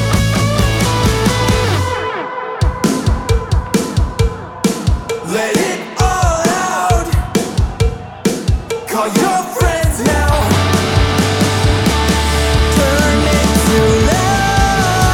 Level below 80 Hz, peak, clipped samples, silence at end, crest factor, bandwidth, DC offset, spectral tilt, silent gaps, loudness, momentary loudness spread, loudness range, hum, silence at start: -20 dBFS; -2 dBFS; under 0.1%; 0 s; 12 dB; 18 kHz; under 0.1%; -5 dB/octave; none; -14 LUFS; 6 LU; 4 LU; none; 0 s